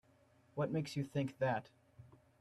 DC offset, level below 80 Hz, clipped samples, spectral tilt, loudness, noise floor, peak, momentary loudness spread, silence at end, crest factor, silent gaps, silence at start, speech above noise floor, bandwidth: under 0.1%; -74 dBFS; under 0.1%; -7 dB/octave; -40 LUFS; -70 dBFS; -24 dBFS; 5 LU; 0.35 s; 16 dB; none; 0.55 s; 31 dB; 13 kHz